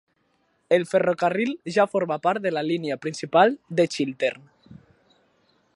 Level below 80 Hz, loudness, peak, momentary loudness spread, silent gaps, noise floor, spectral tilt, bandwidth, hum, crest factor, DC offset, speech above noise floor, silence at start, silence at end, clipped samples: -72 dBFS; -23 LUFS; -2 dBFS; 8 LU; none; -68 dBFS; -5.5 dB/octave; 11.5 kHz; none; 22 dB; under 0.1%; 45 dB; 0.7 s; 1 s; under 0.1%